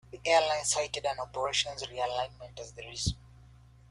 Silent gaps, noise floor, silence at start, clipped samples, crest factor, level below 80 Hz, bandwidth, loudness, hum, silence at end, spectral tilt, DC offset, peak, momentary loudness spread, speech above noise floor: none; -56 dBFS; 0.15 s; under 0.1%; 22 dB; -52 dBFS; 12.5 kHz; -31 LUFS; none; 0.45 s; -2 dB/octave; under 0.1%; -12 dBFS; 18 LU; 24 dB